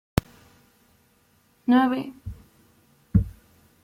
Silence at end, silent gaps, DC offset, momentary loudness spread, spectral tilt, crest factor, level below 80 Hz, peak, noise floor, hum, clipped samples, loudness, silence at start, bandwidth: 0.55 s; none; under 0.1%; 22 LU; -7 dB/octave; 24 dB; -40 dBFS; -2 dBFS; -63 dBFS; none; under 0.1%; -25 LUFS; 1.7 s; 16.5 kHz